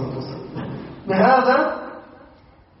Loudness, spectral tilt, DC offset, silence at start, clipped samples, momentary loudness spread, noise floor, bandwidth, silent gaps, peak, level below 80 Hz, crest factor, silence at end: -19 LUFS; -4.5 dB/octave; under 0.1%; 0 s; under 0.1%; 19 LU; -50 dBFS; 6 kHz; none; -4 dBFS; -54 dBFS; 18 dB; 0.75 s